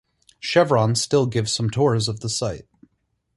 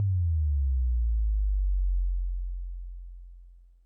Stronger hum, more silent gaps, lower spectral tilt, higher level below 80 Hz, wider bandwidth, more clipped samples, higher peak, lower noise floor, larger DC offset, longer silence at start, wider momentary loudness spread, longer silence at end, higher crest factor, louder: second, none vs 60 Hz at -95 dBFS; neither; second, -4.5 dB/octave vs -12 dB/octave; second, -52 dBFS vs -28 dBFS; first, 11.5 kHz vs 0.1 kHz; neither; first, -4 dBFS vs -22 dBFS; first, -71 dBFS vs -51 dBFS; neither; first, 0.45 s vs 0 s; second, 10 LU vs 18 LU; first, 0.75 s vs 0.3 s; first, 18 dB vs 6 dB; first, -21 LUFS vs -30 LUFS